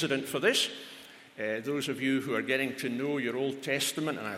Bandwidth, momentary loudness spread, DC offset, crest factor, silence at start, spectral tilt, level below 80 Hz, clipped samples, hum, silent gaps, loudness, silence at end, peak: 16.5 kHz; 11 LU; under 0.1%; 18 dB; 0 s; -3.5 dB/octave; -78 dBFS; under 0.1%; none; none; -30 LUFS; 0 s; -14 dBFS